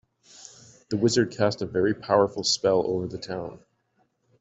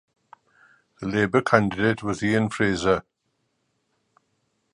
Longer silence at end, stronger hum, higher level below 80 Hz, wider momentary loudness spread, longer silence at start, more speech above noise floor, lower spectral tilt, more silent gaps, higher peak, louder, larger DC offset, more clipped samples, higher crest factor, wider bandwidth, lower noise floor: second, 0.85 s vs 1.75 s; neither; second, -62 dBFS vs -52 dBFS; first, 22 LU vs 7 LU; about the same, 0.9 s vs 1 s; second, 46 dB vs 52 dB; second, -4.5 dB/octave vs -6 dB/octave; neither; second, -6 dBFS vs 0 dBFS; about the same, -25 LUFS vs -23 LUFS; neither; neither; about the same, 20 dB vs 24 dB; second, 8.2 kHz vs 11 kHz; second, -70 dBFS vs -74 dBFS